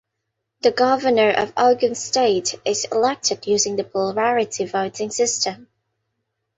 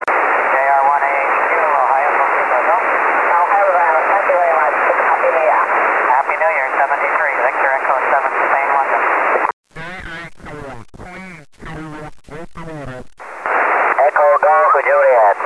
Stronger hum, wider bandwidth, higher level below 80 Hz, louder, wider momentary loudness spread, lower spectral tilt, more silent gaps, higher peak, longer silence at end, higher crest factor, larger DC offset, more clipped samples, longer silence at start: neither; second, 8.2 kHz vs 11 kHz; second, -62 dBFS vs -48 dBFS; second, -20 LUFS vs -13 LUFS; second, 6 LU vs 20 LU; second, -2.5 dB/octave vs -5 dB/octave; second, none vs 9.53-9.63 s; about the same, -4 dBFS vs -2 dBFS; first, 0.95 s vs 0 s; about the same, 16 dB vs 14 dB; second, under 0.1% vs 0.2%; neither; first, 0.65 s vs 0 s